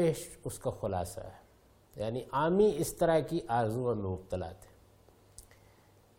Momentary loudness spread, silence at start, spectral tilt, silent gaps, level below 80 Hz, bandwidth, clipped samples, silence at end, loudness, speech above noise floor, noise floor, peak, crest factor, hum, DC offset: 14 LU; 0 s; -6 dB/octave; none; -56 dBFS; 16.5 kHz; under 0.1%; 0.8 s; -32 LUFS; 31 dB; -63 dBFS; -16 dBFS; 18 dB; none; under 0.1%